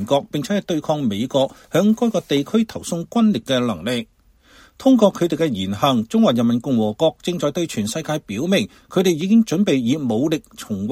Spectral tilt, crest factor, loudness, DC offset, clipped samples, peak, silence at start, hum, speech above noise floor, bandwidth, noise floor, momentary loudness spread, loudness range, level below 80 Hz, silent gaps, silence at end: -5.5 dB/octave; 18 dB; -19 LUFS; under 0.1%; under 0.1%; -2 dBFS; 0 s; none; 32 dB; 15.5 kHz; -51 dBFS; 8 LU; 2 LU; -56 dBFS; none; 0 s